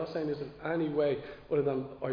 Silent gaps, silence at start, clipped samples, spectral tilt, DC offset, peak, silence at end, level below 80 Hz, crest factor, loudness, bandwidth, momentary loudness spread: none; 0 s; under 0.1%; -6.5 dB/octave; under 0.1%; -18 dBFS; 0 s; -62 dBFS; 14 dB; -33 LUFS; 5.2 kHz; 7 LU